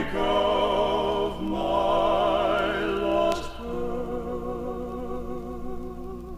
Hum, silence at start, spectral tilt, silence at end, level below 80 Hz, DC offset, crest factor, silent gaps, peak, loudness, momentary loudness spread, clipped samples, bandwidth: 60 Hz at -55 dBFS; 0 s; -5.5 dB/octave; 0 s; -40 dBFS; under 0.1%; 16 dB; none; -10 dBFS; -26 LUFS; 13 LU; under 0.1%; 15.5 kHz